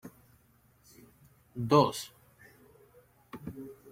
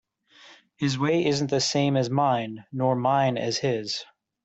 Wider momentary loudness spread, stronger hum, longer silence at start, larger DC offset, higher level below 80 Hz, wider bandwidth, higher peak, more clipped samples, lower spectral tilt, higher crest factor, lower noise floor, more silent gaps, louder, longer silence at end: first, 24 LU vs 7 LU; neither; second, 0.05 s vs 0.45 s; neither; about the same, -68 dBFS vs -64 dBFS; first, 16.5 kHz vs 8.2 kHz; about the same, -12 dBFS vs -10 dBFS; neither; about the same, -6 dB/octave vs -5 dB/octave; first, 24 dB vs 16 dB; first, -65 dBFS vs -54 dBFS; neither; second, -29 LUFS vs -25 LUFS; second, 0.2 s vs 0.4 s